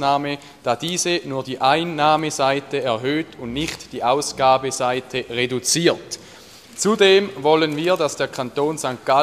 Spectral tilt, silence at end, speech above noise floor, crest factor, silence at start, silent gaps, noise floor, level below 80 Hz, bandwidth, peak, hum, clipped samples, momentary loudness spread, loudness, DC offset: -3.5 dB/octave; 0 s; 23 dB; 18 dB; 0 s; none; -43 dBFS; -54 dBFS; 15 kHz; -2 dBFS; none; under 0.1%; 9 LU; -20 LUFS; under 0.1%